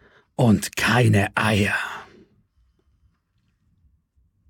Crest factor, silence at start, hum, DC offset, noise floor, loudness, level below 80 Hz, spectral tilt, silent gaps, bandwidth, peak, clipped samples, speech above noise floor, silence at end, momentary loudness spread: 18 dB; 0.4 s; none; under 0.1%; -68 dBFS; -20 LUFS; -54 dBFS; -5.5 dB/octave; none; 17 kHz; -6 dBFS; under 0.1%; 49 dB; 2.45 s; 15 LU